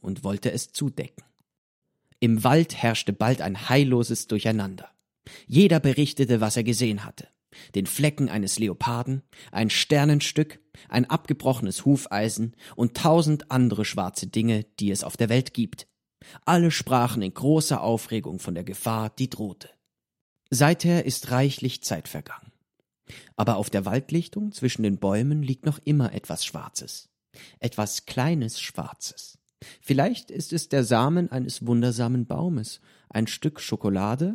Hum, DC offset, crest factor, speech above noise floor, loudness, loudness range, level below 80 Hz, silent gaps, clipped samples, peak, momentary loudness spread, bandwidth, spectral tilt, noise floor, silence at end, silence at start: none; under 0.1%; 22 dB; 51 dB; -25 LUFS; 5 LU; -60 dBFS; 1.58-1.82 s, 20.21-20.36 s; under 0.1%; -4 dBFS; 13 LU; 16.5 kHz; -5.5 dB/octave; -75 dBFS; 0 s; 0.05 s